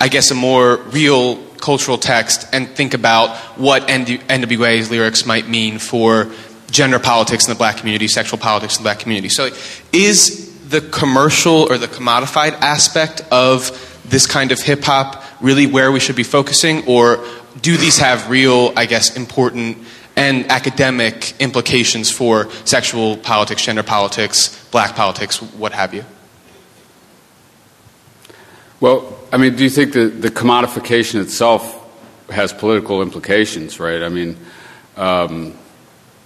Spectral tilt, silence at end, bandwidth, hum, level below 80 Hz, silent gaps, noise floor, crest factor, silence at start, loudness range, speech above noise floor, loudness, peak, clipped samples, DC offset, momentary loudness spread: -3 dB/octave; 0.75 s; 15 kHz; none; -50 dBFS; none; -48 dBFS; 14 dB; 0 s; 6 LU; 34 dB; -13 LUFS; 0 dBFS; under 0.1%; under 0.1%; 9 LU